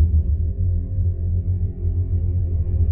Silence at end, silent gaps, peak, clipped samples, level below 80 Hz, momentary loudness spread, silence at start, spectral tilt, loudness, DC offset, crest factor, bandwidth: 0 s; none; -6 dBFS; under 0.1%; -24 dBFS; 3 LU; 0 s; -15 dB/octave; -23 LUFS; under 0.1%; 12 dB; 0.8 kHz